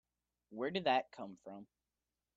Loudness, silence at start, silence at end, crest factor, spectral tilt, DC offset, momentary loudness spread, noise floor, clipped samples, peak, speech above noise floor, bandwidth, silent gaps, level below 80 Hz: -37 LUFS; 0.5 s; 0.75 s; 22 dB; -6 dB/octave; under 0.1%; 20 LU; under -90 dBFS; under 0.1%; -20 dBFS; over 51 dB; 7.6 kHz; none; -82 dBFS